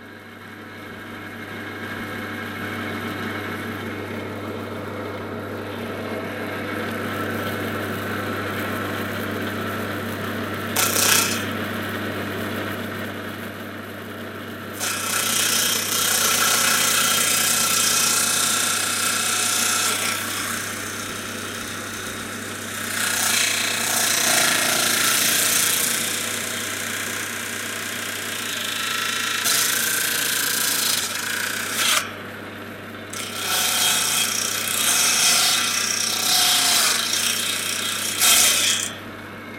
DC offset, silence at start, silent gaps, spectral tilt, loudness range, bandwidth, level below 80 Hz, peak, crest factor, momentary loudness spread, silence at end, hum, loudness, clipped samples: under 0.1%; 0 s; none; -1 dB/octave; 12 LU; 17 kHz; -60 dBFS; 0 dBFS; 24 dB; 15 LU; 0 s; none; -20 LUFS; under 0.1%